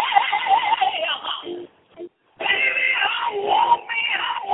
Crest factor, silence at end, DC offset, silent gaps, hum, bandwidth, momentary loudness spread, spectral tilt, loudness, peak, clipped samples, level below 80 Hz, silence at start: 20 dB; 0 s; under 0.1%; none; none; 4.1 kHz; 16 LU; -6 dB/octave; -20 LUFS; -2 dBFS; under 0.1%; -68 dBFS; 0 s